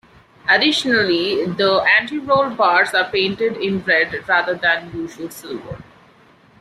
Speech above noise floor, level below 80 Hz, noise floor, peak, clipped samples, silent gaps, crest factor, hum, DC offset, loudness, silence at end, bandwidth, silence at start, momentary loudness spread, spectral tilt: 32 dB; -54 dBFS; -50 dBFS; -2 dBFS; under 0.1%; none; 16 dB; none; under 0.1%; -16 LUFS; 0.8 s; 14.5 kHz; 0.45 s; 16 LU; -4 dB/octave